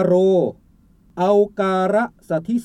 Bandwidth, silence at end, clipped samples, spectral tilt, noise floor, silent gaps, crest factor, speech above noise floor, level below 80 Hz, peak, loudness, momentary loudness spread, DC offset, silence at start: 10.5 kHz; 0 s; under 0.1%; -7.5 dB/octave; -53 dBFS; none; 14 dB; 35 dB; -56 dBFS; -4 dBFS; -19 LUFS; 10 LU; under 0.1%; 0 s